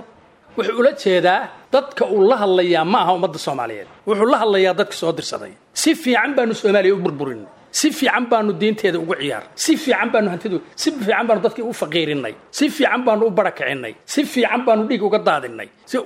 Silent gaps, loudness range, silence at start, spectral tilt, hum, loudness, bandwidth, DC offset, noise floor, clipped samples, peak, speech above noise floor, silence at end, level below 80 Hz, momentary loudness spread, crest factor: none; 2 LU; 0 s; -4 dB/octave; none; -18 LUFS; 16 kHz; under 0.1%; -48 dBFS; under 0.1%; -2 dBFS; 30 dB; 0 s; -68 dBFS; 10 LU; 18 dB